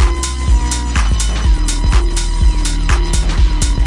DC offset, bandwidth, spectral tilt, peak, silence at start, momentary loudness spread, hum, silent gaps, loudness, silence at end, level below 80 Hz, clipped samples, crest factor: under 0.1%; 11.5 kHz; -4 dB/octave; -2 dBFS; 0 s; 2 LU; none; none; -16 LUFS; 0 s; -12 dBFS; under 0.1%; 10 dB